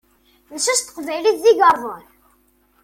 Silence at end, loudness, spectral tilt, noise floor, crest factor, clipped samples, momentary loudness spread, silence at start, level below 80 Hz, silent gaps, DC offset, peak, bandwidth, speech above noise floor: 0.85 s; -17 LUFS; -0.5 dB/octave; -59 dBFS; 18 dB; under 0.1%; 20 LU; 0.5 s; -60 dBFS; none; under 0.1%; -2 dBFS; 16.5 kHz; 42 dB